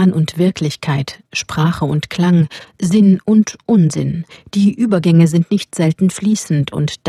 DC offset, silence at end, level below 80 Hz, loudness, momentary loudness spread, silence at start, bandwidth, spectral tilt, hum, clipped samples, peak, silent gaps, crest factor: under 0.1%; 0 s; -48 dBFS; -15 LUFS; 10 LU; 0 s; 13 kHz; -6.5 dB/octave; none; under 0.1%; 0 dBFS; none; 14 dB